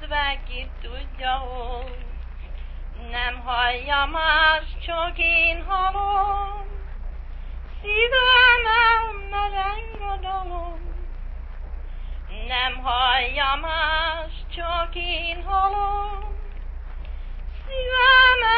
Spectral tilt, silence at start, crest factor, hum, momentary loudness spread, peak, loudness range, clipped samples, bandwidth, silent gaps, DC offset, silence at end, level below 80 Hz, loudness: -7 dB/octave; 0 s; 18 dB; none; 22 LU; -4 dBFS; 11 LU; under 0.1%; 5 kHz; none; under 0.1%; 0 s; -32 dBFS; -20 LUFS